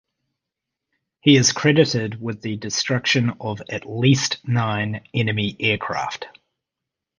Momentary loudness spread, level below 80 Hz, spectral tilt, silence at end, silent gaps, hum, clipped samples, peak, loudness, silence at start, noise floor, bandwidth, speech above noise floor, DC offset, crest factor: 13 LU; -54 dBFS; -4.5 dB/octave; 0.9 s; none; none; under 0.1%; 0 dBFS; -20 LUFS; 1.25 s; -84 dBFS; 10 kHz; 64 dB; under 0.1%; 22 dB